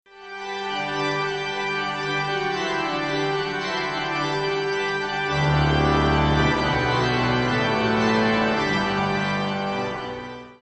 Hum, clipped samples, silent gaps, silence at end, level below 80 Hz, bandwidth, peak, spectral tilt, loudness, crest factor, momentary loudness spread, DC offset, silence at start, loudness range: none; under 0.1%; none; 0.1 s; -38 dBFS; 8.2 kHz; -6 dBFS; -5.5 dB/octave; -23 LUFS; 16 dB; 8 LU; under 0.1%; 0.15 s; 4 LU